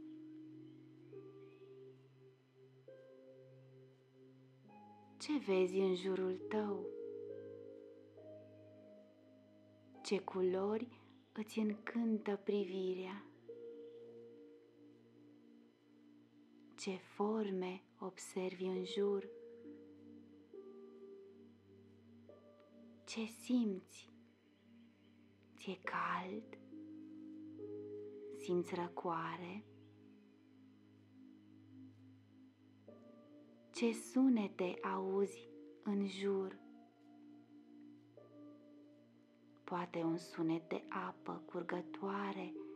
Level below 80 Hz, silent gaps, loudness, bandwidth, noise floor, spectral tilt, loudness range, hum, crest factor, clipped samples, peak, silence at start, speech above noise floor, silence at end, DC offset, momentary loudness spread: under -90 dBFS; none; -42 LUFS; 13 kHz; -68 dBFS; -6 dB/octave; 19 LU; none; 20 dB; under 0.1%; -26 dBFS; 0 s; 28 dB; 0 s; under 0.1%; 25 LU